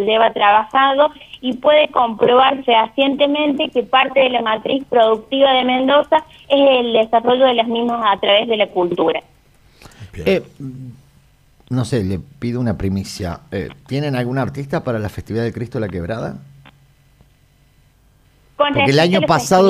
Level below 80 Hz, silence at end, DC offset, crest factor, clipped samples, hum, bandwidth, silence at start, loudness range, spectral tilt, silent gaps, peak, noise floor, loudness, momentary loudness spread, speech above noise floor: -46 dBFS; 0 s; under 0.1%; 14 dB; under 0.1%; none; 15 kHz; 0 s; 10 LU; -5.5 dB/octave; none; -2 dBFS; -53 dBFS; -16 LUFS; 12 LU; 37 dB